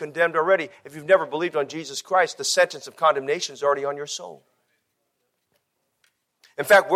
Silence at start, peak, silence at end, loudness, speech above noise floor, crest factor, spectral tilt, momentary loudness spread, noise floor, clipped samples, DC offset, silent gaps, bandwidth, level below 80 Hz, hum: 0 s; -4 dBFS; 0 s; -22 LUFS; 53 dB; 20 dB; -2.5 dB/octave; 13 LU; -75 dBFS; under 0.1%; under 0.1%; none; 15.5 kHz; -74 dBFS; none